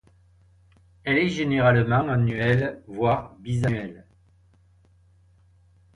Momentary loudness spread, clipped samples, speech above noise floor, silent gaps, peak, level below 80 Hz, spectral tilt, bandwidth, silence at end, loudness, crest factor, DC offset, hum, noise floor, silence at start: 11 LU; under 0.1%; 36 dB; none; -6 dBFS; -50 dBFS; -7.5 dB/octave; 10 kHz; 2 s; -23 LUFS; 20 dB; under 0.1%; none; -58 dBFS; 1.05 s